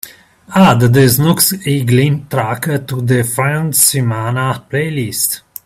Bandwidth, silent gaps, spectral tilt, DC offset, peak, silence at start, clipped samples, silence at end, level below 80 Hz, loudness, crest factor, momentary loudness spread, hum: 16.5 kHz; none; -4.5 dB/octave; under 0.1%; 0 dBFS; 0.05 s; under 0.1%; 0.25 s; -46 dBFS; -13 LUFS; 14 dB; 9 LU; none